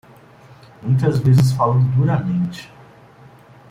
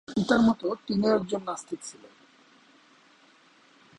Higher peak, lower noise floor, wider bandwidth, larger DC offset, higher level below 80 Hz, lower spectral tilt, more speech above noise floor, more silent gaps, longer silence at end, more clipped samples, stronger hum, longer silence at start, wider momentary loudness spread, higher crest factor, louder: first, -4 dBFS vs -8 dBFS; second, -45 dBFS vs -59 dBFS; about the same, 11.5 kHz vs 11 kHz; neither; first, -48 dBFS vs -62 dBFS; first, -8 dB/octave vs -5.5 dB/octave; second, 29 dB vs 33 dB; neither; second, 1.05 s vs 2.05 s; neither; neither; first, 0.8 s vs 0.1 s; second, 12 LU vs 16 LU; about the same, 16 dB vs 20 dB; first, -17 LUFS vs -27 LUFS